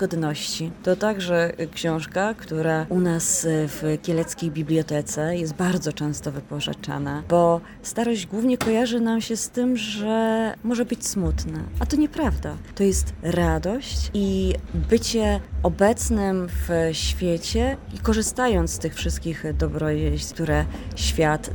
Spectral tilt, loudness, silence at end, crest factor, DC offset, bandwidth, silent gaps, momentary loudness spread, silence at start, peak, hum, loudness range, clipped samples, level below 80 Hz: -5 dB/octave; -24 LUFS; 0 s; 18 dB; under 0.1%; 18 kHz; none; 7 LU; 0 s; -6 dBFS; none; 2 LU; under 0.1%; -34 dBFS